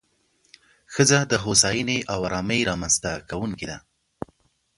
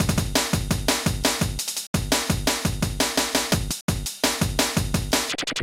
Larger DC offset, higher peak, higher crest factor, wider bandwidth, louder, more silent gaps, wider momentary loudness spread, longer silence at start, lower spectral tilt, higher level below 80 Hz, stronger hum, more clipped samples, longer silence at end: neither; first, -2 dBFS vs -6 dBFS; about the same, 22 dB vs 18 dB; second, 11.5 kHz vs 17 kHz; about the same, -22 LUFS vs -23 LUFS; second, none vs 1.87-1.94 s, 3.81-3.88 s; first, 21 LU vs 4 LU; first, 0.9 s vs 0 s; about the same, -3 dB/octave vs -3.5 dB/octave; second, -48 dBFS vs -34 dBFS; neither; neither; first, 1 s vs 0 s